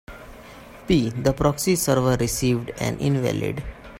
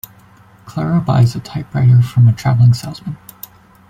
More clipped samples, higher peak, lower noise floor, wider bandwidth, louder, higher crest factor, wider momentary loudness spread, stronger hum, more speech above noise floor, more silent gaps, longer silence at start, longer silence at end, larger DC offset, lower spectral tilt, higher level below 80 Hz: neither; second, -6 dBFS vs -2 dBFS; about the same, -43 dBFS vs -45 dBFS; about the same, 16.5 kHz vs 15.5 kHz; second, -22 LUFS vs -14 LUFS; first, 18 dB vs 12 dB; about the same, 22 LU vs 20 LU; neither; second, 21 dB vs 32 dB; neither; second, 0.1 s vs 0.65 s; second, 0 s vs 0.75 s; neither; second, -5.5 dB/octave vs -7.5 dB/octave; first, -40 dBFS vs -46 dBFS